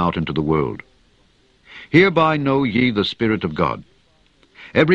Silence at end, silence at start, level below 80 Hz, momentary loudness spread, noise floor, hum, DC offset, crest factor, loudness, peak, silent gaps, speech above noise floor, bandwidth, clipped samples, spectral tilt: 0 s; 0 s; -46 dBFS; 11 LU; -57 dBFS; none; under 0.1%; 20 dB; -18 LUFS; 0 dBFS; none; 39 dB; 8 kHz; under 0.1%; -7.5 dB/octave